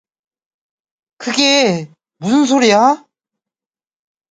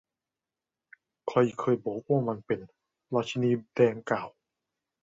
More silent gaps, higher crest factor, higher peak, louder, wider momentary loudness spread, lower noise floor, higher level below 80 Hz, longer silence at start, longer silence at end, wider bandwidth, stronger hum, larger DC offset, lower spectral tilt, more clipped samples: neither; second, 16 dB vs 22 dB; first, 0 dBFS vs -10 dBFS; first, -13 LUFS vs -29 LUFS; first, 13 LU vs 9 LU; about the same, under -90 dBFS vs under -90 dBFS; first, -64 dBFS vs -70 dBFS; about the same, 1.2 s vs 1.25 s; first, 1.35 s vs 0.75 s; first, 9.4 kHz vs 7.8 kHz; neither; neither; second, -3.5 dB/octave vs -7.5 dB/octave; neither